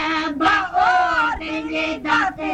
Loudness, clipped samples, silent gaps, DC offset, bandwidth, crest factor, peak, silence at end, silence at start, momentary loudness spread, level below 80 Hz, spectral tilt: -19 LUFS; under 0.1%; none; under 0.1%; 9.4 kHz; 16 dB; -4 dBFS; 0 s; 0 s; 6 LU; -46 dBFS; -3.5 dB/octave